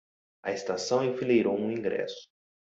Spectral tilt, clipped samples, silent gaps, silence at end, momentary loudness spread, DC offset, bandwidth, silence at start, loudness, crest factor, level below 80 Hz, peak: -5 dB/octave; under 0.1%; none; 0.4 s; 13 LU; under 0.1%; 8 kHz; 0.45 s; -29 LUFS; 16 dB; -72 dBFS; -12 dBFS